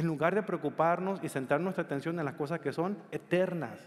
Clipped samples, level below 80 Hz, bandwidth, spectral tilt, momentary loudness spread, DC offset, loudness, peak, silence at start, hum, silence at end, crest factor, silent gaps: under 0.1%; -74 dBFS; 14 kHz; -7 dB/octave; 6 LU; under 0.1%; -32 LUFS; -12 dBFS; 0 s; none; 0 s; 20 dB; none